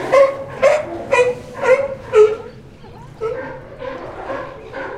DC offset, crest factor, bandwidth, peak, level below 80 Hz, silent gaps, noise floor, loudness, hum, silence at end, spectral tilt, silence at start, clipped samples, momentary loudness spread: under 0.1%; 18 dB; 11.5 kHz; 0 dBFS; -46 dBFS; none; -38 dBFS; -17 LUFS; none; 0 s; -4.5 dB/octave; 0 s; under 0.1%; 17 LU